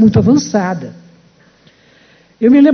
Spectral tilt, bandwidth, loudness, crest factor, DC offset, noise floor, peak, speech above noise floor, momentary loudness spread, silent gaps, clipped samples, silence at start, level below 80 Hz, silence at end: -7 dB/octave; 6.6 kHz; -13 LUFS; 12 dB; under 0.1%; -48 dBFS; 0 dBFS; 38 dB; 15 LU; none; under 0.1%; 0 s; -40 dBFS; 0 s